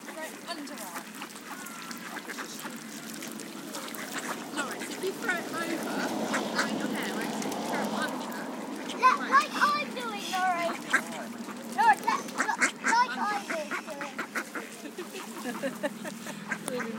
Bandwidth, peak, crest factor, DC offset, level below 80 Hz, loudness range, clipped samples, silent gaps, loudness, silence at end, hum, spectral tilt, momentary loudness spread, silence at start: 17 kHz; -10 dBFS; 22 dB; under 0.1%; -82 dBFS; 10 LU; under 0.1%; none; -31 LUFS; 0 s; none; -2.5 dB/octave; 14 LU; 0 s